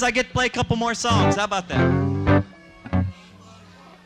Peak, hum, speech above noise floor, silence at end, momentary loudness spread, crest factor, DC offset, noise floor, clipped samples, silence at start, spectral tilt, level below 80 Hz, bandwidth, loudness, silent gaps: -6 dBFS; none; 26 dB; 0.95 s; 7 LU; 16 dB; under 0.1%; -47 dBFS; under 0.1%; 0 s; -5 dB/octave; -42 dBFS; 10.5 kHz; -21 LUFS; none